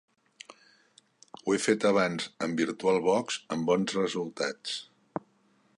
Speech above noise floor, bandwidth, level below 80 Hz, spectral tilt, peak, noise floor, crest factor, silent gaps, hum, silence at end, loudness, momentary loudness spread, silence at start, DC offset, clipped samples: 39 dB; 11.5 kHz; -72 dBFS; -4.5 dB/octave; -12 dBFS; -67 dBFS; 18 dB; none; none; 0.6 s; -29 LUFS; 16 LU; 1.45 s; under 0.1%; under 0.1%